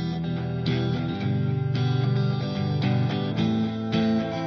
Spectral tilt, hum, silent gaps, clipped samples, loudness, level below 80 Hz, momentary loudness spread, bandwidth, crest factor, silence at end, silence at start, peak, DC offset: -8 dB/octave; none; none; under 0.1%; -25 LUFS; -56 dBFS; 3 LU; 6.4 kHz; 12 dB; 0 s; 0 s; -12 dBFS; under 0.1%